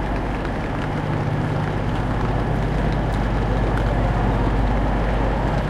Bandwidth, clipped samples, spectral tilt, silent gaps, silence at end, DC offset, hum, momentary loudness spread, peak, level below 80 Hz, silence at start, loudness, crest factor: 9.6 kHz; under 0.1%; -8 dB/octave; none; 0 s; under 0.1%; none; 4 LU; -8 dBFS; -24 dBFS; 0 s; -22 LUFS; 12 dB